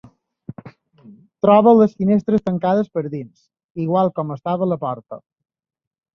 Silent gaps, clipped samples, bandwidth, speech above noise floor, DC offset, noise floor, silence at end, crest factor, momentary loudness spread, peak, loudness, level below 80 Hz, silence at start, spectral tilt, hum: 3.64-3.75 s; under 0.1%; 6.2 kHz; 30 dB; under 0.1%; -47 dBFS; 0.95 s; 18 dB; 24 LU; -2 dBFS; -18 LUFS; -60 dBFS; 0.65 s; -10 dB/octave; none